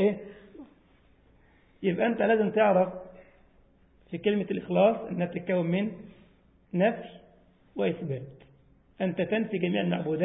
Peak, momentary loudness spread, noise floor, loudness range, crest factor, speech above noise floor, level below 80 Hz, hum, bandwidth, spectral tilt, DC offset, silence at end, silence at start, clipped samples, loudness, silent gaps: -10 dBFS; 19 LU; -61 dBFS; 5 LU; 18 dB; 34 dB; -64 dBFS; none; 3.9 kHz; -11 dB/octave; under 0.1%; 0 s; 0 s; under 0.1%; -28 LUFS; none